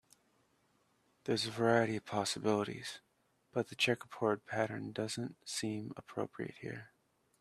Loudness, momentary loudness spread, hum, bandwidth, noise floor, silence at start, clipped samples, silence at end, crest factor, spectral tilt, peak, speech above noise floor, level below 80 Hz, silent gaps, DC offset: -37 LUFS; 13 LU; none; 14.5 kHz; -75 dBFS; 1.25 s; under 0.1%; 0.55 s; 22 dB; -4.5 dB/octave; -16 dBFS; 38 dB; -76 dBFS; none; under 0.1%